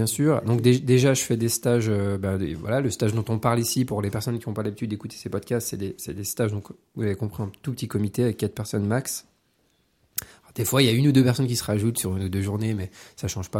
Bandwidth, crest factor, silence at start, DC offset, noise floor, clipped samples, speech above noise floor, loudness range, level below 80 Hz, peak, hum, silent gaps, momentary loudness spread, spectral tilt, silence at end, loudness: 16.5 kHz; 20 dB; 0 s; under 0.1%; -67 dBFS; under 0.1%; 43 dB; 7 LU; -56 dBFS; -4 dBFS; none; none; 13 LU; -5.5 dB/octave; 0 s; -25 LUFS